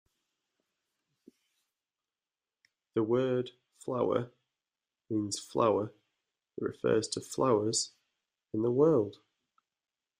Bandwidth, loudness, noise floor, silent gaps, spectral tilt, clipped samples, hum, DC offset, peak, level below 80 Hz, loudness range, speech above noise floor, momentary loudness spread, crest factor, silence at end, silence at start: 15 kHz; -31 LUFS; under -90 dBFS; none; -5 dB/octave; under 0.1%; none; under 0.1%; -14 dBFS; -74 dBFS; 6 LU; over 60 dB; 13 LU; 20 dB; 1.05 s; 2.95 s